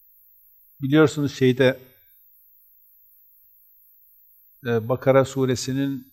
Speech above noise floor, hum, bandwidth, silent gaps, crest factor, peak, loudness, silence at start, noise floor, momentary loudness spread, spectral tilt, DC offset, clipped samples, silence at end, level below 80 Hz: 35 dB; 50 Hz at -65 dBFS; 16 kHz; none; 20 dB; -4 dBFS; -21 LUFS; 0.8 s; -55 dBFS; 10 LU; -6 dB/octave; under 0.1%; under 0.1%; 0.1 s; -64 dBFS